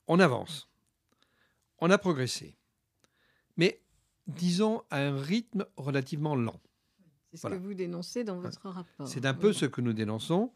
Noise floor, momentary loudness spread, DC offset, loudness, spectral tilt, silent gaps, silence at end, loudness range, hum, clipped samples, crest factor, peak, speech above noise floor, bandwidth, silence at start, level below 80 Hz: -75 dBFS; 16 LU; under 0.1%; -31 LUFS; -5.5 dB/octave; none; 0.05 s; 5 LU; none; under 0.1%; 24 dB; -8 dBFS; 45 dB; 14 kHz; 0.1 s; -74 dBFS